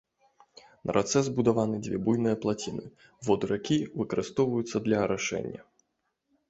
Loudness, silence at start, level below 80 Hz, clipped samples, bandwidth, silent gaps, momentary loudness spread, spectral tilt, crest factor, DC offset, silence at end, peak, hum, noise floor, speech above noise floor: -29 LUFS; 0.85 s; -60 dBFS; under 0.1%; 8.2 kHz; none; 11 LU; -5.5 dB/octave; 20 dB; under 0.1%; 0.85 s; -8 dBFS; none; -79 dBFS; 51 dB